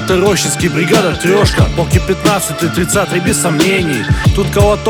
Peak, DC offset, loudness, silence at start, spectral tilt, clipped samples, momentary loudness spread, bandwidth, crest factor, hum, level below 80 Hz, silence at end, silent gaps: 0 dBFS; under 0.1%; -12 LUFS; 0 s; -4.5 dB/octave; under 0.1%; 3 LU; over 20 kHz; 12 dB; none; -24 dBFS; 0 s; none